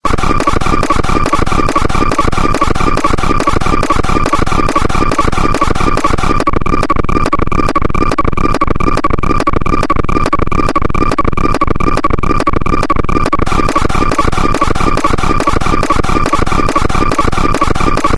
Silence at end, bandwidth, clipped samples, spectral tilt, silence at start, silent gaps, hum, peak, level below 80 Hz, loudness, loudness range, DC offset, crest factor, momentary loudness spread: 0 s; 11 kHz; 0.1%; -5.5 dB/octave; 0.05 s; none; none; 0 dBFS; -16 dBFS; -13 LUFS; 1 LU; 2%; 10 dB; 1 LU